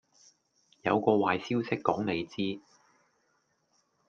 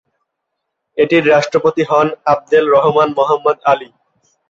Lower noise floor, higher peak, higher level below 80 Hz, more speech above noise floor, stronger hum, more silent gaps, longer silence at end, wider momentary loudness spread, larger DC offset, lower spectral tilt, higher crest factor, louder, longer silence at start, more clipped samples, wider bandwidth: about the same, -74 dBFS vs -75 dBFS; second, -8 dBFS vs -2 dBFS; second, -72 dBFS vs -58 dBFS; second, 45 dB vs 62 dB; neither; neither; first, 1.5 s vs 0.65 s; first, 9 LU vs 6 LU; neither; about the same, -6.5 dB/octave vs -5.5 dB/octave; first, 24 dB vs 14 dB; second, -30 LUFS vs -13 LUFS; about the same, 0.85 s vs 0.95 s; neither; about the same, 7.4 kHz vs 7.6 kHz